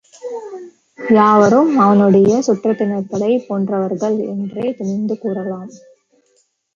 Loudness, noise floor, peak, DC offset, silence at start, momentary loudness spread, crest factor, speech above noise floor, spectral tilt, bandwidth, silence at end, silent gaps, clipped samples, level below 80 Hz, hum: -15 LUFS; -61 dBFS; -2 dBFS; under 0.1%; 0.25 s; 19 LU; 14 dB; 46 dB; -7.5 dB/octave; 7.4 kHz; 1 s; none; under 0.1%; -60 dBFS; none